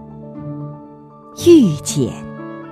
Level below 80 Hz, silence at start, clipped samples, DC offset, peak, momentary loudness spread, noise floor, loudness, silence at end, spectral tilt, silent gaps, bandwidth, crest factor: -52 dBFS; 0 s; under 0.1%; under 0.1%; 0 dBFS; 24 LU; -40 dBFS; -14 LUFS; 0 s; -6 dB/octave; none; 14.5 kHz; 18 dB